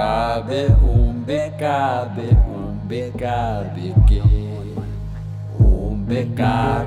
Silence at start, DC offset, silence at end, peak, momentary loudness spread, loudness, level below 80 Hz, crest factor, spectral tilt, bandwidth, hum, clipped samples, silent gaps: 0 s; under 0.1%; 0 s; -4 dBFS; 13 LU; -20 LUFS; -20 dBFS; 14 dB; -8 dB/octave; 8 kHz; none; under 0.1%; none